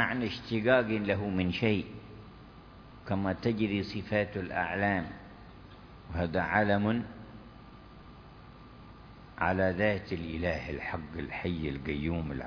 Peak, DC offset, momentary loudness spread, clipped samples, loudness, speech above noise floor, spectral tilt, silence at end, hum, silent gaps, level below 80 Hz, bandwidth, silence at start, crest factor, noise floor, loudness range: -10 dBFS; under 0.1%; 24 LU; under 0.1%; -31 LUFS; 20 dB; -8 dB/octave; 0 s; none; none; -52 dBFS; 5.4 kHz; 0 s; 22 dB; -51 dBFS; 3 LU